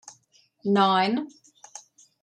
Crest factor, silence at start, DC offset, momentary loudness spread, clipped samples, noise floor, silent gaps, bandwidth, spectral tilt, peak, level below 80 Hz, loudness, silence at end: 18 dB; 0.05 s; under 0.1%; 24 LU; under 0.1%; -63 dBFS; none; 9.4 kHz; -5 dB/octave; -8 dBFS; -78 dBFS; -23 LUFS; 0.45 s